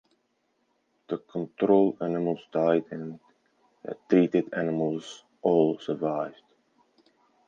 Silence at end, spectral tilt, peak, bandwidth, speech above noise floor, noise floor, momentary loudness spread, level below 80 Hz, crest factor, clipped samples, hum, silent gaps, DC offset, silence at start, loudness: 1.15 s; -8 dB/octave; -8 dBFS; 7.6 kHz; 47 dB; -73 dBFS; 16 LU; -76 dBFS; 20 dB; under 0.1%; none; none; under 0.1%; 1.1 s; -27 LUFS